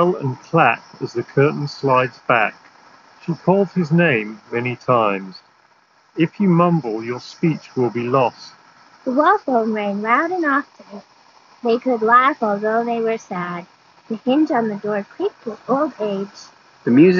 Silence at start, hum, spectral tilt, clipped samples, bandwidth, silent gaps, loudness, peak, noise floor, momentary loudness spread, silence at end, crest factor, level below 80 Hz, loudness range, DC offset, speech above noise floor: 0 s; none; -5.5 dB/octave; under 0.1%; 7 kHz; none; -19 LUFS; -2 dBFS; -56 dBFS; 12 LU; 0 s; 18 dB; -68 dBFS; 3 LU; under 0.1%; 37 dB